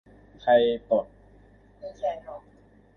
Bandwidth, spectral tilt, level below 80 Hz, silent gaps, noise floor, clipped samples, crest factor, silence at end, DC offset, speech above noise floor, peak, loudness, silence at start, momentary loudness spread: 6.4 kHz; -6.5 dB/octave; -58 dBFS; none; -55 dBFS; under 0.1%; 20 dB; 0.6 s; under 0.1%; 30 dB; -8 dBFS; -25 LUFS; 0.45 s; 23 LU